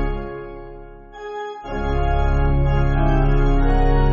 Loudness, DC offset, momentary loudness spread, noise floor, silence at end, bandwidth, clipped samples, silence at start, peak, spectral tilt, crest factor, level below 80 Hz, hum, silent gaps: -21 LUFS; under 0.1%; 18 LU; -38 dBFS; 0 s; 4.7 kHz; under 0.1%; 0 s; -6 dBFS; -7 dB/octave; 12 dB; -20 dBFS; none; none